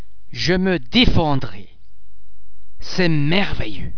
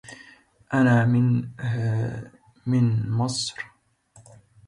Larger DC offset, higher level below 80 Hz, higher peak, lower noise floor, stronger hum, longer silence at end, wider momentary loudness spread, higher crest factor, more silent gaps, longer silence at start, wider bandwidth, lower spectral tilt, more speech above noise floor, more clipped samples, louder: neither; first, -30 dBFS vs -56 dBFS; first, 0 dBFS vs -8 dBFS; second, -43 dBFS vs -56 dBFS; neither; second, 0 s vs 1 s; second, 16 LU vs 19 LU; about the same, 18 dB vs 16 dB; neither; about the same, 0 s vs 0.1 s; second, 5.4 kHz vs 11 kHz; about the same, -6 dB/octave vs -6 dB/octave; second, 27 dB vs 34 dB; neither; first, -19 LUFS vs -23 LUFS